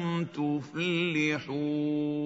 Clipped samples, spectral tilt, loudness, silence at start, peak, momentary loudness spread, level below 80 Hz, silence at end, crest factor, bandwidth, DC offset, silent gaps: under 0.1%; -6 dB/octave; -30 LUFS; 0 s; -16 dBFS; 4 LU; -72 dBFS; 0 s; 14 dB; 7.8 kHz; under 0.1%; none